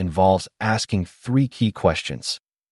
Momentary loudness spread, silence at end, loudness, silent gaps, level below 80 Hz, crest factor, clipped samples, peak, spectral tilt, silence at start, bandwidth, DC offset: 9 LU; 0.35 s; -22 LUFS; none; -46 dBFS; 18 dB; under 0.1%; -4 dBFS; -5.5 dB/octave; 0 s; 11.5 kHz; under 0.1%